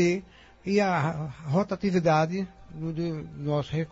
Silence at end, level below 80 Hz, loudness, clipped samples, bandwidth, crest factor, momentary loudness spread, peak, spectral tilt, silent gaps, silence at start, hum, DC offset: 0 s; -54 dBFS; -28 LUFS; under 0.1%; 8 kHz; 16 dB; 11 LU; -12 dBFS; -7 dB/octave; none; 0 s; none; under 0.1%